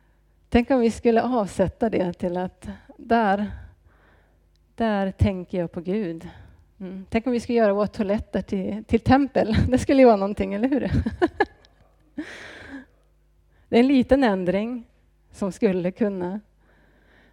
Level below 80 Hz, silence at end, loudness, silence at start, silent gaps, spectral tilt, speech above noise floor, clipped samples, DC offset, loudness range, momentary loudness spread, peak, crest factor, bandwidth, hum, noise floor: -42 dBFS; 0.95 s; -23 LUFS; 0.5 s; none; -7 dB/octave; 38 dB; under 0.1%; under 0.1%; 7 LU; 19 LU; -4 dBFS; 18 dB; 11.5 kHz; none; -60 dBFS